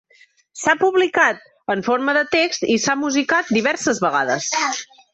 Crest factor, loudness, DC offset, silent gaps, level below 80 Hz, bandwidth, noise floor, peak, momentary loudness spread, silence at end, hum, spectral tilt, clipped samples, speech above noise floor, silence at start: 16 dB; -18 LUFS; under 0.1%; none; -62 dBFS; 8.2 kHz; -54 dBFS; -4 dBFS; 7 LU; 0.3 s; none; -2.5 dB/octave; under 0.1%; 36 dB; 0.55 s